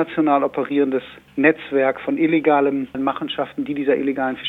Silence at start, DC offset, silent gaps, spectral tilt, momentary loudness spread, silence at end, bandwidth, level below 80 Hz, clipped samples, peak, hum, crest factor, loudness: 0 s; under 0.1%; none; -7.5 dB/octave; 8 LU; 0 s; 4.1 kHz; -60 dBFS; under 0.1%; -2 dBFS; none; 18 dB; -20 LUFS